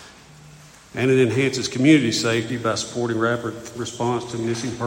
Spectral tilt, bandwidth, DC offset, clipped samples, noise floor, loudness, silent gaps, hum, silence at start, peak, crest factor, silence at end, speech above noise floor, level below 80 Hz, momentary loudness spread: -5 dB/octave; 16.5 kHz; under 0.1%; under 0.1%; -46 dBFS; -21 LUFS; none; none; 0 s; -4 dBFS; 18 dB; 0 s; 25 dB; -56 dBFS; 11 LU